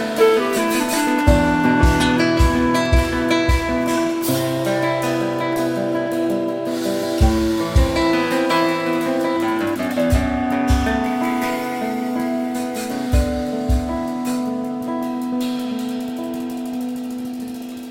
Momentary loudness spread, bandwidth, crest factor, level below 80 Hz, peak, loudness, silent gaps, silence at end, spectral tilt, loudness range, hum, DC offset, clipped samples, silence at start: 9 LU; 16.5 kHz; 18 dB; -26 dBFS; -2 dBFS; -19 LUFS; none; 0 s; -5.5 dB/octave; 7 LU; none; under 0.1%; under 0.1%; 0 s